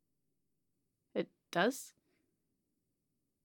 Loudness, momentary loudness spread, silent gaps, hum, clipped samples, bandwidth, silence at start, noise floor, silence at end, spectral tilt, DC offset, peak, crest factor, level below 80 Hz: -38 LUFS; 13 LU; none; none; under 0.1%; 17.5 kHz; 1.15 s; -86 dBFS; 1.55 s; -4 dB/octave; under 0.1%; -16 dBFS; 26 dB; under -90 dBFS